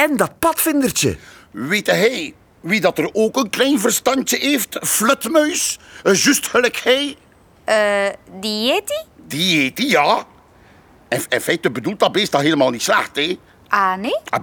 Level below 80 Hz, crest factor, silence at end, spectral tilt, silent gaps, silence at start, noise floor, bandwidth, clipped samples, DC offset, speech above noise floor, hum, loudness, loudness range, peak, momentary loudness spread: -54 dBFS; 18 dB; 0 s; -3 dB/octave; none; 0 s; -48 dBFS; over 20 kHz; under 0.1%; under 0.1%; 31 dB; none; -17 LUFS; 3 LU; -2 dBFS; 9 LU